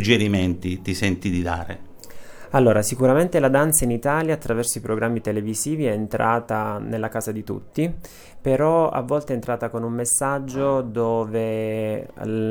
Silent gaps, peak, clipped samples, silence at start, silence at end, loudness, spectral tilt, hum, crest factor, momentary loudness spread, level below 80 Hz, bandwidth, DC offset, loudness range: none; -2 dBFS; under 0.1%; 0 s; 0 s; -22 LUFS; -5 dB/octave; none; 20 dB; 10 LU; -44 dBFS; over 20 kHz; under 0.1%; 4 LU